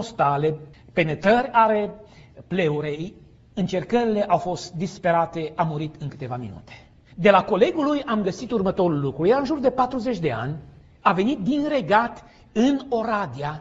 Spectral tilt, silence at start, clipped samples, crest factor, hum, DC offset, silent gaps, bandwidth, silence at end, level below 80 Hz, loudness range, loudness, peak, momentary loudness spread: -6.5 dB/octave; 0 s; under 0.1%; 20 dB; none; under 0.1%; none; 8 kHz; 0 s; -52 dBFS; 3 LU; -23 LUFS; -2 dBFS; 13 LU